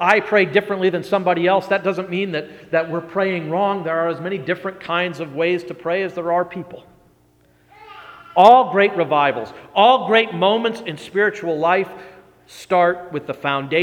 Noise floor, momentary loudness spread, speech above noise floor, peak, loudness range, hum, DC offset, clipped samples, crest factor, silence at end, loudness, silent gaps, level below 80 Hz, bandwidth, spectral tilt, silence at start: -56 dBFS; 11 LU; 38 dB; 0 dBFS; 8 LU; none; under 0.1%; under 0.1%; 18 dB; 0 s; -18 LUFS; none; -64 dBFS; 14.5 kHz; -6 dB/octave; 0 s